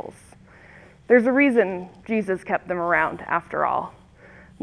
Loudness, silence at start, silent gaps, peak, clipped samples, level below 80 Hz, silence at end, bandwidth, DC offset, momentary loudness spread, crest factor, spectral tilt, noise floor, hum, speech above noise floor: -22 LUFS; 0.05 s; none; -4 dBFS; under 0.1%; -58 dBFS; 0.7 s; 11 kHz; under 0.1%; 10 LU; 18 dB; -7 dB/octave; -49 dBFS; none; 27 dB